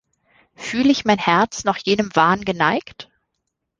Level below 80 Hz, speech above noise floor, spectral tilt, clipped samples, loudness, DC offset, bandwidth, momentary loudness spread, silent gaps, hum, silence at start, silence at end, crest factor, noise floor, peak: -54 dBFS; 58 dB; -4.5 dB/octave; under 0.1%; -18 LUFS; under 0.1%; 9.8 kHz; 10 LU; none; none; 0.6 s; 0.75 s; 18 dB; -77 dBFS; -2 dBFS